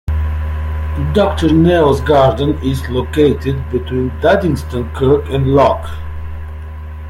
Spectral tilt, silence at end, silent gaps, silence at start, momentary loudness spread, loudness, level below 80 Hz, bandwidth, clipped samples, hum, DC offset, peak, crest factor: -7.5 dB/octave; 0 s; none; 0.05 s; 16 LU; -14 LUFS; -26 dBFS; 14.5 kHz; under 0.1%; none; under 0.1%; -2 dBFS; 12 dB